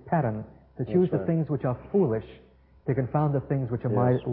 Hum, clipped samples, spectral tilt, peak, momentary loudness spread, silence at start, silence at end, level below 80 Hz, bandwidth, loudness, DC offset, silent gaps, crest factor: none; under 0.1%; -13.5 dB/octave; -10 dBFS; 10 LU; 0.05 s; 0 s; -52 dBFS; 4 kHz; -27 LUFS; under 0.1%; none; 16 dB